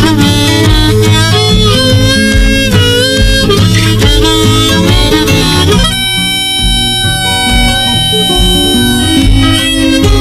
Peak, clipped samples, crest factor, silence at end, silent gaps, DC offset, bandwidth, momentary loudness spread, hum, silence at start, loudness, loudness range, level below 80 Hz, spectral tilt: 0 dBFS; 0.7%; 8 dB; 0 s; none; under 0.1%; 15.5 kHz; 2 LU; none; 0 s; -7 LUFS; 1 LU; -16 dBFS; -4 dB/octave